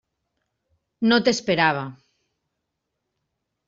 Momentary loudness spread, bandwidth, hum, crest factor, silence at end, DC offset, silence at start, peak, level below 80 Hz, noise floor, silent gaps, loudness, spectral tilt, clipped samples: 11 LU; 7.6 kHz; none; 22 dB; 1.75 s; under 0.1%; 1 s; -4 dBFS; -64 dBFS; -80 dBFS; none; -21 LUFS; -3 dB/octave; under 0.1%